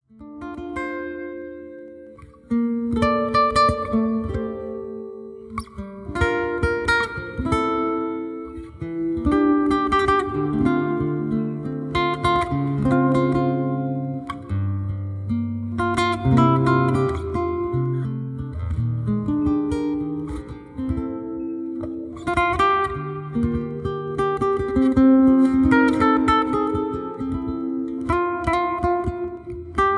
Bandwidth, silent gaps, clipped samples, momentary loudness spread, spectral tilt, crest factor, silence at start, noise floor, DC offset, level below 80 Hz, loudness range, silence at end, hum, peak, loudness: 10.5 kHz; none; under 0.1%; 15 LU; -7.5 dB/octave; 18 dB; 0.2 s; -44 dBFS; under 0.1%; -38 dBFS; 7 LU; 0 s; none; -4 dBFS; -22 LUFS